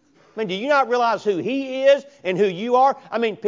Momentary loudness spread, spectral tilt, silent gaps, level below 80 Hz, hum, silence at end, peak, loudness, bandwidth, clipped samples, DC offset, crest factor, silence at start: 9 LU; -5.5 dB/octave; none; -76 dBFS; none; 0 s; -4 dBFS; -20 LUFS; 7.6 kHz; under 0.1%; under 0.1%; 16 dB; 0.35 s